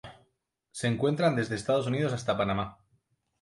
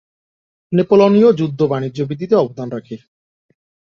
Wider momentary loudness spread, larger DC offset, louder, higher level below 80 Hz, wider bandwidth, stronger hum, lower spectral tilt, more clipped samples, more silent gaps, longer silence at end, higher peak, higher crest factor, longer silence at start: second, 7 LU vs 17 LU; neither; second, -29 LUFS vs -15 LUFS; about the same, -58 dBFS vs -58 dBFS; first, 11.5 kHz vs 7 kHz; neither; second, -6 dB/octave vs -8.5 dB/octave; neither; neither; second, 0.7 s vs 1 s; second, -14 dBFS vs -2 dBFS; about the same, 18 dB vs 16 dB; second, 0.05 s vs 0.7 s